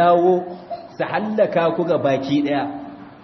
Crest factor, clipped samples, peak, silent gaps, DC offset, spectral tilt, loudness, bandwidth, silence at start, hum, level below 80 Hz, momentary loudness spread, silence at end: 16 dB; under 0.1%; -4 dBFS; none; under 0.1%; -7.5 dB/octave; -20 LUFS; 6.2 kHz; 0 s; none; -62 dBFS; 16 LU; 0.1 s